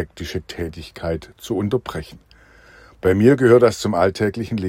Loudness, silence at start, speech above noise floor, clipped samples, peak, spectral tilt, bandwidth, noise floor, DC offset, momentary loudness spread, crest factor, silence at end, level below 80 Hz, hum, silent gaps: -19 LUFS; 0 s; 30 dB; under 0.1%; 0 dBFS; -6.5 dB/octave; 16 kHz; -49 dBFS; under 0.1%; 16 LU; 18 dB; 0 s; -46 dBFS; none; none